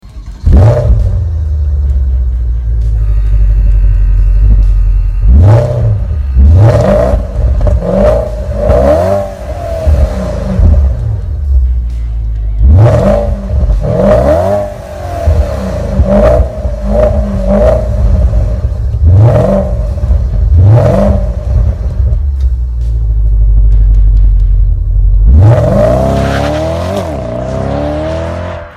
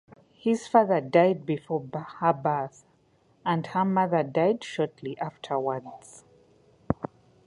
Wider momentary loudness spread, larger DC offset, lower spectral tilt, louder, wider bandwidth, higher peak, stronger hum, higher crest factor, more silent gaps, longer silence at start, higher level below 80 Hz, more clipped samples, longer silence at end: second, 10 LU vs 13 LU; neither; first, -9 dB/octave vs -7 dB/octave; first, -10 LUFS vs -27 LUFS; second, 7.4 kHz vs 11 kHz; first, 0 dBFS vs -6 dBFS; neither; second, 8 dB vs 22 dB; neither; second, 0.05 s vs 0.45 s; first, -10 dBFS vs -60 dBFS; first, 0.5% vs under 0.1%; second, 0 s vs 0.4 s